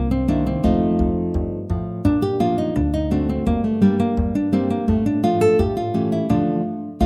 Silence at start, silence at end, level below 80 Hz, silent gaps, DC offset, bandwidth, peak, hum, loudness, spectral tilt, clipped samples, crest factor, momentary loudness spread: 0 s; 0 s; -30 dBFS; none; under 0.1%; 12 kHz; -4 dBFS; none; -20 LUFS; -9 dB/octave; under 0.1%; 16 dB; 6 LU